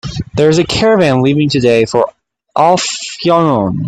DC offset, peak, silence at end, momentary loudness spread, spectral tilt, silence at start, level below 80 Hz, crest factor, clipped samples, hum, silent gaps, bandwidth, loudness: under 0.1%; 0 dBFS; 0 s; 7 LU; -5.5 dB/octave; 0.05 s; -40 dBFS; 12 dB; under 0.1%; none; none; 11 kHz; -12 LUFS